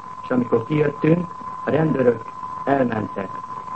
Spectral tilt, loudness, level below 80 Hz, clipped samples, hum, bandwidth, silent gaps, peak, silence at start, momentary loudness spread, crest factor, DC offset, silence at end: -9 dB/octave; -22 LUFS; -58 dBFS; under 0.1%; none; 8.4 kHz; none; -2 dBFS; 0 s; 12 LU; 18 dB; 0.4%; 0 s